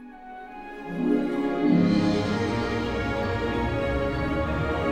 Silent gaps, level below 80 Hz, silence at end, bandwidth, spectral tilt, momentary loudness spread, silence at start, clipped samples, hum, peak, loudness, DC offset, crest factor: none; -38 dBFS; 0 s; 11 kHz; -7 dB/octave; 17 LU; 0 s; under 0.1%; none; -10 dBFS; -25 LUFS; under 0.1%; 16 dB